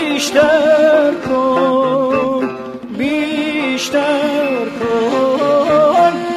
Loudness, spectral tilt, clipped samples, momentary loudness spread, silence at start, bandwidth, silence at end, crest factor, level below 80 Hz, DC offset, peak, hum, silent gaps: -14 LUFS; -4 dB/octave; under 0.1%; 8 LU; 0 s; 14 kHz; 0 s; 14 dB; -52 dBFS; under 0.1%; 0 dBFS; none; none